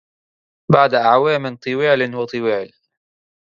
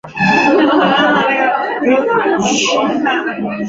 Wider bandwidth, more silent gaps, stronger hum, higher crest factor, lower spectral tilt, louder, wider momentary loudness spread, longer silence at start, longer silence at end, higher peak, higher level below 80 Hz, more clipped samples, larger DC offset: about the same, 7.4 kHz vs 7.8 kHz; neither; neither; first, 18 dB vs 12 dB; first, -7.5 dB/octave vs -4 dB/octave; second, -17 LUFS vs -13 LUFS; first, 10 LU vs 5 LU; first, 0.7 s vs 0.05 s; first, 0.8 s vs 0 s; about the same, 0 dBFS vs 0 dBFS; second, -62 dBFS vs -52 dBFS; neither; neither